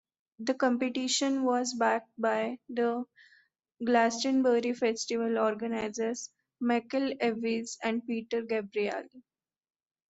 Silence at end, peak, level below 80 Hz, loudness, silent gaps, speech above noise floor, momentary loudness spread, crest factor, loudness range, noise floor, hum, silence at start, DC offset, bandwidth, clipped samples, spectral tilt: 0.9 s; -12 dBFS; -76 dBFS; -30 LUFS; none; 37 dB; 8 LU; 18 dB; 3 LU; -66 dBFS; none; 0.4 s; under 0.1%; 8.2 kHz; under 0.1%; -3 dB/octave